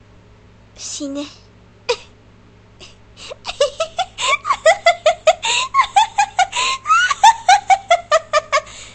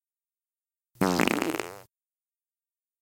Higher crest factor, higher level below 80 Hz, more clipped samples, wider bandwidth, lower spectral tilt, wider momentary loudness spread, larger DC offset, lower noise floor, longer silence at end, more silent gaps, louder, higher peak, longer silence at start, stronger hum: second, 18 dB vs 26 dB; first, -50 dBFS vs -64 dBFS; neither; second, 11 kHz vs 17 kHz; second, -0.5 dB/octave vs -4.5 dB/octave; first, 17 LU vs 11 LU; neither; second, -46 dBFS vs under -90 dBFS; second, 0.05 s vs 1.2 s; neither; first, -16 LUFS vs -27 LUFS; first, 0 dBFS vs -6 dBFS; second, 0.8 s vs 1 s; neither